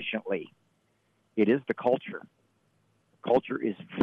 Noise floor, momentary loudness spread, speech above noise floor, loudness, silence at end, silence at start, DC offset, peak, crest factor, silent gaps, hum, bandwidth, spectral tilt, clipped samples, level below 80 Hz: -71 dBFS; 16 LU; 43 dB; -29 LUFS; 0 s; 0 s; under 0.1%; -12 dBFS; 18 dB; none; none; 5.8 kHz; -8 dB/octave; under 0.1%; -74 dBFS